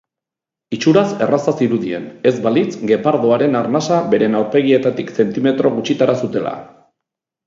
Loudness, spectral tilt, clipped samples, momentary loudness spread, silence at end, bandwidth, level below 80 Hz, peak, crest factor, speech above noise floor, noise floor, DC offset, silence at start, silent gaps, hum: -16 LUFS; -6.5 dB/octave; under 0.1%; 6 LU; 0.8 s; 7.6 kHz; -62 dBFS; 0 dBFS; 16 dB; 71 dB; -86 dBFS; under 0.1%; 0.7 s; none; none